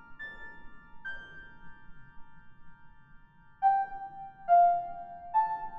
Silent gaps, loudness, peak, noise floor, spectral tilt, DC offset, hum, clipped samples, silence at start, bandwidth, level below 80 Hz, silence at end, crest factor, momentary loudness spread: none; -29 LUFS; -14 dBFS; -54 dBFS; -6.5 dB/octave; under 0.1%; none; under 0.1%; 0 s; 3.7 kHz; -58 dBFS; 0 s; 18 dB; 25 LU